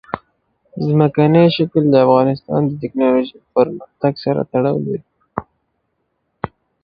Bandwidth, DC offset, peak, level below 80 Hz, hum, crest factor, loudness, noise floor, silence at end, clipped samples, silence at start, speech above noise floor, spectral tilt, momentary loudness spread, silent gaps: 5.2 kHz; under 0.1%; 0 dBFS; -54 dBFS; none; 16 dB; -16 LUFS; -69 dBFS; 0.35 s; under 0.1%; 0.15 s; 54 dB; -11 dB/octave; 18 LU; none